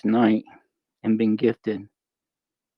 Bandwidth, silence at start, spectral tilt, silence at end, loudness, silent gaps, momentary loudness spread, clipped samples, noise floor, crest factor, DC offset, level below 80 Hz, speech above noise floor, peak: 5.4 kHz; 0.05 s; -9.5 dB/octave; 0.9 s; -23 LUFS; none; 11 LU; under 0.1%; -89 dBFS; 18 dB; under 0.1%; -70 dBFS; 67 dB; -6 dBFS